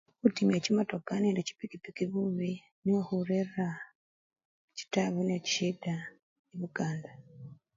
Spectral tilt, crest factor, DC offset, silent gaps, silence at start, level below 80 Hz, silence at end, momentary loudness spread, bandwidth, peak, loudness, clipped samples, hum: -5.5 dB/octave; 22 dB; under 0.1%; 2.72-2.82 s, 3.95-4.30 s, 4.45-4.68 s, 6.23-6.44 s; 0.25 s; -74 dBFS; 0.2 s; 18 LU; 7.6 kHz; -10 dBFS; -33 LUFS; under 0.1%; none